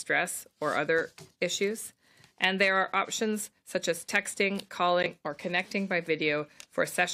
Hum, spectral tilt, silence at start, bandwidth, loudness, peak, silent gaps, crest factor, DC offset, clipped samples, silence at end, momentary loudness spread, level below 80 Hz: none; -3 dB/octave; 0 s; 16 kHz; -29 LUFS; -10 dBFS; none; 20 dB; under 0.1%; under 0.1%; 0 s; 9 LU; -74 dBFS